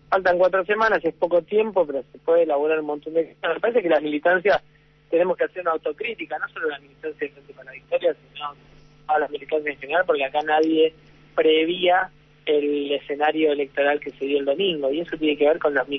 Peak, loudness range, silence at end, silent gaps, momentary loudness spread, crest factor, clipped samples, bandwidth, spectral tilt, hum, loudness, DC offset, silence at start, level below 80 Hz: -6 dBFS; 6 LU; 0 s; none; 10 LU; 16 dB; under 0.1%; 6.2 kHz; -6 dB/octave; none; -22 LUFS; under 0.1%; 0.1 s; -60 dBFS